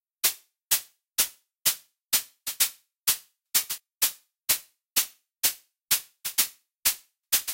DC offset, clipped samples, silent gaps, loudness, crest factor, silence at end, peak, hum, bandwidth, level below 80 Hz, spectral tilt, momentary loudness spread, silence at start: under 0.1%; under 0.1%; 6.75-6.79 s; -26 LUFS; 20 dB; 0 s; -8 dBFS; none; 17 kHz; -66 dBFS; 2.5 dB/octave; 8 LU; 0.25 s